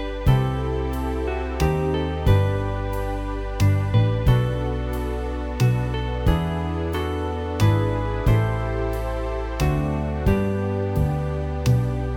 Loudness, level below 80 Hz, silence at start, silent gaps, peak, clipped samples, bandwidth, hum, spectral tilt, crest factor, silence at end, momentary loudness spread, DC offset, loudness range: -23 LUFS; -28 dBFS; 0 s; none; -4 dBFS; under 0.1%; 18 kHz; none; -7.5 dB/octave; 16 dB; 0 s; 7 LU; under 0.1%; 2 LU